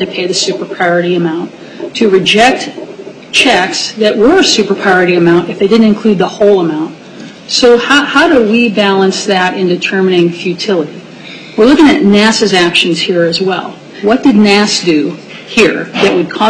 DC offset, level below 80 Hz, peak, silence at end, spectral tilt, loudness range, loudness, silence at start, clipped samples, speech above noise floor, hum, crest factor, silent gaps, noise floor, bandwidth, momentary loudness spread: under 0.1%; -44 dBFS; 0 dBFS; 0 s; -4 dB/octave; 2 LU; -9 LUFS; 0 s; under 0.1%; 21 dB; none; 10 dB; none; -29 dBFS; 11 kHz; 14 LU